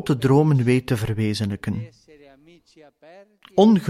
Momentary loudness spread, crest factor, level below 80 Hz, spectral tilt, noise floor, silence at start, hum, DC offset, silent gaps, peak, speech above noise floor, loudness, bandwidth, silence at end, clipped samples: 12 LU; 16 dB; -50 dBFS; -7.5 dB/octave; -52 dBFS; 0 s; none; under 0.1%; none; -6 dBFS; 31 dB; -21 LUFS; 14.5 kHz; 0 s; under 0.1%